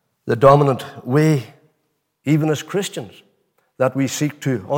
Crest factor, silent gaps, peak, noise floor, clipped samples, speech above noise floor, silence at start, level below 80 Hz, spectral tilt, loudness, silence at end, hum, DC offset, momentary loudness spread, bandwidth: 18 dB; none; -2 dBFS; -70 dBFS; under 0.1%; 53 dB; 0.25 s; -52 dBFS; -6.5 dB/octave; -18 LUFS; 0 s; none; under 0.1%; 14 LU; 17 kHz